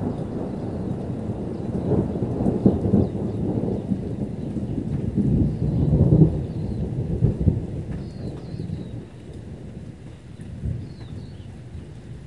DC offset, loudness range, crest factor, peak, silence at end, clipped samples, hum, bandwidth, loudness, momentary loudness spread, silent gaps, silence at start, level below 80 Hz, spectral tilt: 0.2%; 13 LU; 22 dB; -2 dBFS; 0 s; under 0.1%; none; 10.5 kHz; -24 LUFS; 19 LU; none; 0 s; -36 dBFS; -10.5 dB/octave